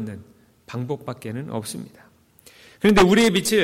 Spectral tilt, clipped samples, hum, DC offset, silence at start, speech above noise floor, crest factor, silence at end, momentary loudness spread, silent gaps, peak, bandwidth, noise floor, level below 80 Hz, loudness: -4.5 dB/octave; under 0.1%; none; under 0.1%; 0 s; 32 dB; 16 dB; 0 s; 21 LU; none; -6 dBFS; 16.5 kHz; -53 dBFS; -44 dBFS; -20 LUFS